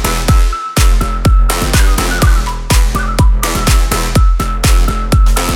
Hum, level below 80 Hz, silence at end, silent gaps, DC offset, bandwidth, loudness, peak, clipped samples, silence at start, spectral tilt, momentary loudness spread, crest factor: none; -12 dBFS; 0 s; none; under 0.1%; 17 kHz; -13 LUFS; 0 dBFS; under 0.1%; 0 s; -4.5 dB/octave; 2 LU; 10 dB